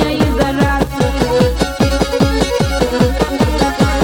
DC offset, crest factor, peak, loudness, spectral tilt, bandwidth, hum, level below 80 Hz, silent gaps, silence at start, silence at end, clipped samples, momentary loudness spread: under 0.1%; 14 dB; 0 dBFS; -14 LUFS; -5.5 dB/octave; 18 kHz; none; -22 dBFS; none; 0 s; 0 s; under 0.1%; 2 LU